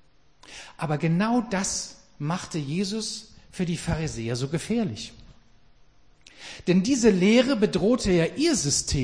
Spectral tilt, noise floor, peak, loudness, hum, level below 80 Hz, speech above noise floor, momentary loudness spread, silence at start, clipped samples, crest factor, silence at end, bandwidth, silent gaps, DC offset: -5 dB/octave; -58 dBFS; -8 dBFS; -25 LUFS; none; -46 dBFS; 34 dB; 18 LU; 0.5 s; under 0.1%; 18 dB; 0 s; 10.5 kHz; none; 0.1%